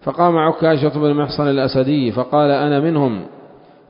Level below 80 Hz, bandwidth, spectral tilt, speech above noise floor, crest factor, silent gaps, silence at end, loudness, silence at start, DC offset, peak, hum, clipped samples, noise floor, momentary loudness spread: -52 dBFS; 5.4 kHz; -12 dB/octave; 28 dB; 14 dB; none; 0.4 s; -16 LUFS; 0.05 s; under 0.1%; -2 dBFS; none; under 0.1%; -43 dBFS; 4 LU